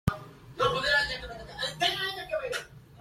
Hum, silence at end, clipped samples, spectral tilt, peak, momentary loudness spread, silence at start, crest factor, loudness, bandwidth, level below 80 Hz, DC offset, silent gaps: none; 0 s; under 0.1%; -3.5 dB/octave; -10 dBFS; 17 LU; 0.05 s; 22 dB; -29 LUFS; 16.5 kHz; -48 dBFS; under 0.1%; none